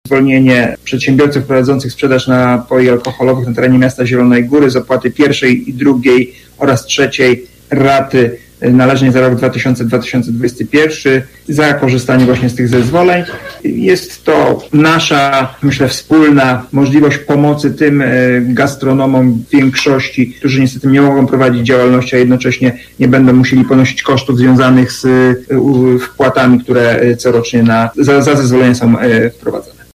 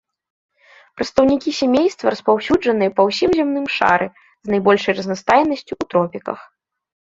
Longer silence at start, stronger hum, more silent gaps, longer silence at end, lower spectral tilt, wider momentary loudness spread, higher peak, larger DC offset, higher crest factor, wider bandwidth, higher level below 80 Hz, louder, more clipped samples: second, 0.05 s vs 1 s; neither; neither; second, 0.35 s vs 0.7 s; about the same, -6.5 dB/octave vs -5.5 dB/octave; second, 5 LU vs 10 LU; about the same, 0 dBFS vs -2 dBFS; neither; second, 10 dB vs 16 dB; first, 15 kHz vs 7.8 kHz; first, -44 dBFS vs -52 dBFS; first, -10 LUFS vs -17 LUFS; neither